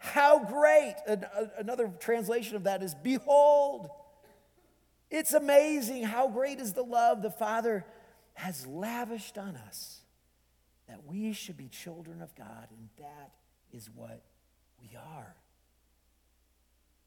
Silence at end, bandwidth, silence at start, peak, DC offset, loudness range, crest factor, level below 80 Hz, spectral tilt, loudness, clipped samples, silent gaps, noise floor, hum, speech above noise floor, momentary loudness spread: 1.8 s; 19 kHz; 0 s; -8 dBFS; under 0.1%; 17 LU; 22 dB; -72 dBFS; -4 dB/octave; -29 LUFS; under 0.1%; none; -70 dBFS; none; 41 dB; 25 LU